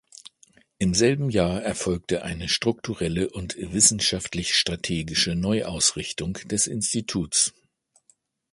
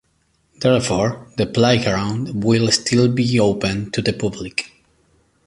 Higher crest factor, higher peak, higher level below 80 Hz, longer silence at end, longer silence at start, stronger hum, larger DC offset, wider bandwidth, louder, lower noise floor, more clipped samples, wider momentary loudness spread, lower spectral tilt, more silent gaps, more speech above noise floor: about the same, 22 dB vs 18 dB; about the same, -4 dBFS vs -2 dBFS; about the same, -46 dBFS vs -46 dBFS; first, 1.05 s vs 0.8 s; first, 0.8 s vs 0.6 s; neither; neither; about the same, 11.5 kHz vs 11.5 kHz; second, -23 LUFS vs -18 LUFS; about the same, -66 dBFS vs -63 dBFS; neither; about the same, 9 LU vs 9 LU; second, -3 dB/octave vs -5 dB/octave; neither; second, 41 dB vs 46 dB